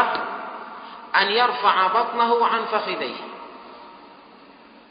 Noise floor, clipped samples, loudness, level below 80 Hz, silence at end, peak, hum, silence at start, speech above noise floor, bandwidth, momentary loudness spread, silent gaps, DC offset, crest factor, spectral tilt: -48 dBFS; under 0.1%; -21 LUFS; -72 dBFS; 0.7 s; -4 dBFS; none; 0 s; 27 dB; 5.2 kHz; 21 LU; none; under 0.1%; 20 dB; -7 dB/octave